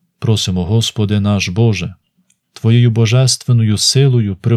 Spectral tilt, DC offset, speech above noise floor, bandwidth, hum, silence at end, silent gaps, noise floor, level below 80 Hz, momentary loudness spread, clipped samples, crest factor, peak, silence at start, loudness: -5 dB/octave; under 0.1%; 48 dB; 13.5 kHz; none; 0 s; none; -60 dBFS; -44 dBFS; 5 LU; under 0.1%; 14 dB; 0 dBFS; 0.2 s; -13 LUFS